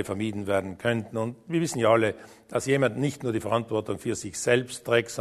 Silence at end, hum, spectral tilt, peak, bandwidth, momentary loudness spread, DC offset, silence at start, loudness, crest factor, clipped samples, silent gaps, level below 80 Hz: 0 s; none; -5 dB/octave; -6 dBFS; 13.5 kHz; 8 LU; under 0.1%; 0 s; -27 LUFS; 20 dB; under 0.1%; none; -62 dBFS